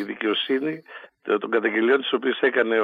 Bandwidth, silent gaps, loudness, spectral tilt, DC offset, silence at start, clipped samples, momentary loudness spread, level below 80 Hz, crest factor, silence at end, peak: 4.9 kHz; none; -23 LUFS; -6.5 dB/octave; under 0.1%; 0 s; under 0.1%; 14 LU; -82 dBFS; 16 dB; 0 s; -6 dBFS